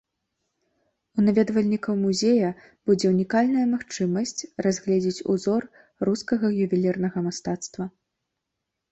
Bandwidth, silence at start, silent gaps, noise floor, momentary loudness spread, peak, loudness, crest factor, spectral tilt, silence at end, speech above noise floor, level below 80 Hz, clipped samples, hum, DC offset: 8.2 kHz; 1.15 s; none; -82 dBFS; 9 LU; -8 dBFS; -24 LUFS; 16 dB; -6 dB/octave; 1.05 s; 59 dB; -62 dBFS; under 0.1%; none; under 0.1%